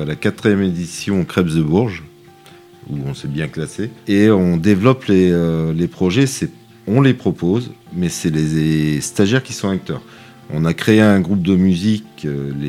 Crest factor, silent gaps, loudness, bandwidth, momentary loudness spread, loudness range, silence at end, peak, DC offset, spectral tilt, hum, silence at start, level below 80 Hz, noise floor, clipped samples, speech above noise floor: 16 dB; none; -17 LUFS; 15 kHz; 12 LU; 4 LU; 0 s; 0 dBFS; under 0.1%; -6.5 dB/octave; none; 0 s; -44 dBFS; -43 dBFS; under 0.1%; 27 dB